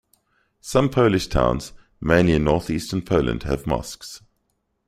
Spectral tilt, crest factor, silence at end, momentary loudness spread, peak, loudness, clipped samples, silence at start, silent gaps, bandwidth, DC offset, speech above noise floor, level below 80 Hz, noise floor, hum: -6 dB/octave; 20 dB; 0.7 s; 19 LU; -2 dBFS; -21 LUFS; under 0.1%; 0.65 s; none; 15.5 kHz; under 0.1%; 51 dB; -36 dBFS; -72 dBFS; none